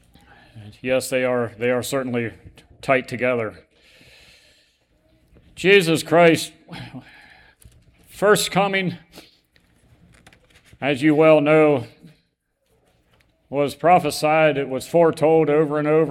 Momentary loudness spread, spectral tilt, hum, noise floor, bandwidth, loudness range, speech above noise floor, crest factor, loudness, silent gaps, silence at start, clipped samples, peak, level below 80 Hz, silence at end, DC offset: 17 LU; -5 dB/octave; none; -70 dBFS; 16.5 kHz; 5 LU; 51 dB; 20 dB; -19 LUFS; none; 0.55 s; under 0.1%; -2 dBFS; -58 dBFS; 0 s; under 0.1%